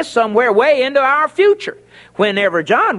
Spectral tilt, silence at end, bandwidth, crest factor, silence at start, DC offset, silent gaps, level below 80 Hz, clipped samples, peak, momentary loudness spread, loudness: -4.5 dB/octave; 0 s; 11.5 kHz; 14 dB; 0 s; under 0.1%; none; -60 dBFS; under 0.1%; 0 dBFS; 7 LU; -14 LUFS